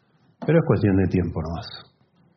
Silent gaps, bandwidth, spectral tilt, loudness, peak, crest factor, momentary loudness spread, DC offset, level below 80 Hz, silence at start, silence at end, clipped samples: none; 6.2 kHz; -7.5 dB/octave; -22 LUFS; -6 dBFS; 18 dB; 16 LU; under 0.1%; -48 dBFS; 0.4 s; 0.55 s; under 0.1%